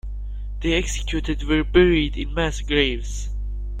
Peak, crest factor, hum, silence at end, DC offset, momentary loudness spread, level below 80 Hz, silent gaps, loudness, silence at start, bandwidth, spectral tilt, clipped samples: -2 dBFS; 20 dB; 50 Hz at -25 dBFS; 0 s; under 0.1%; 15 LU; -28 dBFS; none; -22 LUFS; 0.05 s; 9.8 kHz; -5 dB/octave; under 0.1%